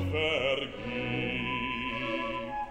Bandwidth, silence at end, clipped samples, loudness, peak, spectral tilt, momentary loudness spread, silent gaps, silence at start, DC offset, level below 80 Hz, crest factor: 15.5 kHz; 0 s; under 0.1%; -31 LUFS; -16 dBFS; -6 dB/octave; 7 LU; none; 0 s; 0.1%; -52 dBFS; 16 dB